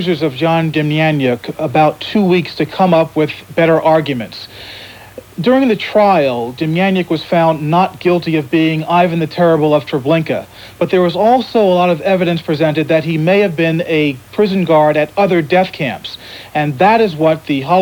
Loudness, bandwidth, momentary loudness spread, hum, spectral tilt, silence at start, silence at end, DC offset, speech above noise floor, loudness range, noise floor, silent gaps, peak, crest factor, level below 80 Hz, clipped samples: -13 LUFS; 19.5 kHz; 9 LU; none; -7.5 dB/octave; 0 s; 0 s; under 0.1%; 22 dB; 2 LU; -35 dBFS; none; 0 dBFS; 14 dB; -52 dBFS; under 0.1%